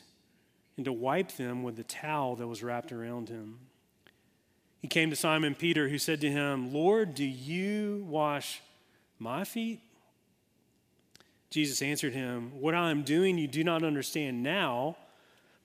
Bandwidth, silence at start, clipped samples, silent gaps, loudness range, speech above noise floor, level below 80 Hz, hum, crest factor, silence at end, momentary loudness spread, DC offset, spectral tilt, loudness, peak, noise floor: 15.5 kHz; 0.75 s; under 0.1%; none; 8 LU; 39 dB; -78 dBFS; none; 22 dB; 0.65 s; 12 LU; under 0.1%; -4.5 dB/octave; -32 LUFS; -10 dBFS; -71 dBFS